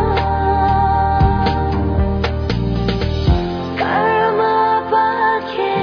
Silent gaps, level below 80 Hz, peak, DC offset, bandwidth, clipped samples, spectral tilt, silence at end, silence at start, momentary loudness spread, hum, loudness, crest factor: none; -24 dBFS; -4 dBFS; under 0.1%; 5.4 kHz; under 0.1%; -8 dB/octave; 0 s; 0 s; 5 LU; none; -16 LUFS; 12 dB